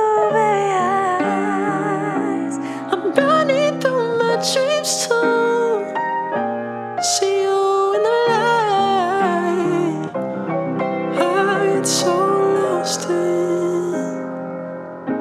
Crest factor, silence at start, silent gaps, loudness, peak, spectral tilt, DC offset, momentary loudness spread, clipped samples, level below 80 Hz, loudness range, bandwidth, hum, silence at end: 18 dB; 0 s; none; -18 LUFS; -2 dBFS; -4 dB/octave; under 0.1%; 8 LU; under 0.1%; -74 dBFS; 2 LU; 15 kHz; none; 0 s